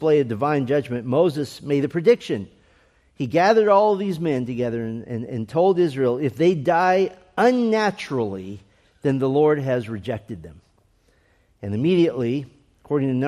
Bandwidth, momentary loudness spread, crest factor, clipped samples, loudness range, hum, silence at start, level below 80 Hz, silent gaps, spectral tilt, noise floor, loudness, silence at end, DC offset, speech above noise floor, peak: 13 kHz; 12 LU; 16 dB; under 0.1%; 5 LU; none; 0 s; -60 dBFS; none; -7.5 dB/octave; -61 dBFS; -21 LUFS; 0 s; under 0.1%; 40 dB; -4 dBFS